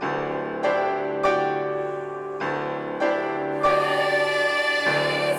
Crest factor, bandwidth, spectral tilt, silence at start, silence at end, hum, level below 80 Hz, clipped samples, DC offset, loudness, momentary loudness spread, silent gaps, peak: 14 dB; 14 kHz; -4.5 dB/octave; 0 s; 0 s; none; -60 dBFS; under 0.1%; under 0.1%; -24 LUFS; 7 LU; none; -10 dBFS